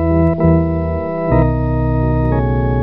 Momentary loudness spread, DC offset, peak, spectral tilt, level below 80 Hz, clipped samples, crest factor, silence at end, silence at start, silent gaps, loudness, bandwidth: 5 LU; 1%; -2 dBFS; -12.5 dB/octave; -22 dBFS; under 0.1%; 12 dB; 0 s; 0 s; none; -15 LUFS; 4.2 kHz